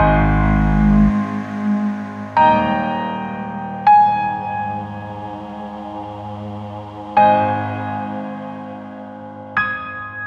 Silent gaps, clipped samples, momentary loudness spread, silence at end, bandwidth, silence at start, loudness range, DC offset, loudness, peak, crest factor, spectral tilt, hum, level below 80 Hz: none; under 0.1%; 17 LU; 0 s; 6.6 kHz; 0 s; 4 LU; under 0.1%; -17 LUFS; -2 dBFS; 16 dB; -8.5 dB/octave; none; -30 dBFS